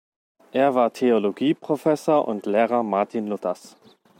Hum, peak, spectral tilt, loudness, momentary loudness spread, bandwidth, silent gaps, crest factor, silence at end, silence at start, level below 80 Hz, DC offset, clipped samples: none; -6 dBFS; -6.5 dB/octave; -22 LUFS; 8 LU; 16.5 kHz; none; 16 dB; 0.5 s; 0.55 s; -76 dBFS; under 0.1%; under 0.1%